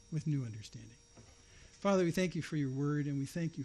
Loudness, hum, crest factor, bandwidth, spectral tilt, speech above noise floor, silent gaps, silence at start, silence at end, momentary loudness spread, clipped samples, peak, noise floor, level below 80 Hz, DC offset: -36 LUFS; none; 16 dB; 12.5 kHz; -6.5 dB/octave; 24 dB; none; 0.1 s; 0 s; 18 LU; under 0.1%; -20 dBFS; -59 dBFS; -64 dBFS; under 0.1%